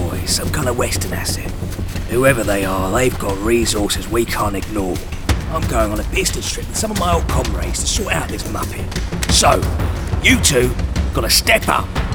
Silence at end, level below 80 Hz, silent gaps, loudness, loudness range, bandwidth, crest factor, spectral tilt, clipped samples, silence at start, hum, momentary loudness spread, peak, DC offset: 0 s; -24 dBFS; none; -17 LUFS; 4 LU; over 20 kHz; 18 dB; -4 dB/octave; under 0.1%; 0 s; none; 11 LU; 0 dBFS; under 0.1%